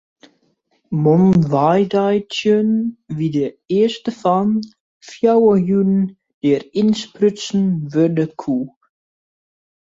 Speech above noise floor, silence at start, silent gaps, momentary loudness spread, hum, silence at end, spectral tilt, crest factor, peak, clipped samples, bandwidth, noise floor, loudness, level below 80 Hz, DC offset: 47 dB; 0.9 s; 4.80-5.01 s, 6.34-6.41 s; 9 LU; none; 1.15 s; -7.5 dB/octave; 14 dB; -2 dBFS; under 0.1%; 7.8 kHz; -63 dBFS; -17 LUFS; -56 dBFS; under 0.1%